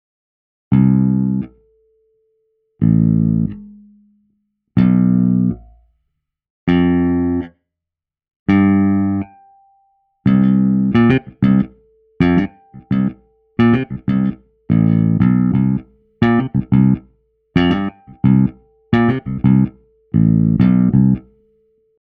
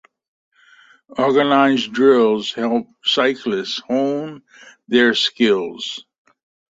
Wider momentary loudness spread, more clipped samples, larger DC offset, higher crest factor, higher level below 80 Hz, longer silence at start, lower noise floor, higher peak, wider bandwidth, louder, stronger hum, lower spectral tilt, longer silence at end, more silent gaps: second, 9 LU vs 13 LU; neither; neither; about the same, 16 dB vs 18 dB; first, -40 dBFS vs -64 dBFS; second, 0.7 s vs 1.1 s; first, -86 dBFS vs -51 dBFS; about the same, 0 dBFS vs -2 dBFS; second, 4.8 kHz vs 7.8 kHz; about the same, -16 LUFS vs -17 LUFS; neither; first, -10.5 dB/octave vs -4.5 dB/octave; about the same, 0.8 s vs 0.75 s; first, 6.50-6.67 s, 8.36-8.46 s vs none